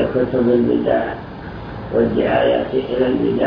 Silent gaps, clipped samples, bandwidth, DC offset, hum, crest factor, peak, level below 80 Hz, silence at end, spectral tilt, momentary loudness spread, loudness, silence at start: none; under 0.1%; 5.4 kHz; under 0.1%; none; 14 dB; -4 dBFS; -40 dBFS; 0 s; -9.5 dB/octave; 15 LU; -17 LUFS; 0 s